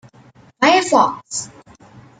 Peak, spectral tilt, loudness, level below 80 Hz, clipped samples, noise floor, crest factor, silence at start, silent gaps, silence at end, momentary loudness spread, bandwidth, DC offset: 0 dBFS; -2.5 dB/octave; -16 LUFS; -60 dBFS; under 0.1%; -48 dBFS; 18 dB; 0.6 s; none; 0.75 s; 14 LU; 9.4 kHz; under 0.1%